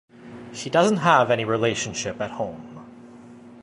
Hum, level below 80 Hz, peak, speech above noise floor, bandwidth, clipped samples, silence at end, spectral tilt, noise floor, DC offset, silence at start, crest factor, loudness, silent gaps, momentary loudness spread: none; -60 dBFS; -4 dBFS; 23 dB; 11.5 kHz; under 0.1%; 0 s; -4.5 dB/octave; -44 dBFS; under 0.1%; 0.2 s; 20 dB; -22 LUFS; none; 24 LU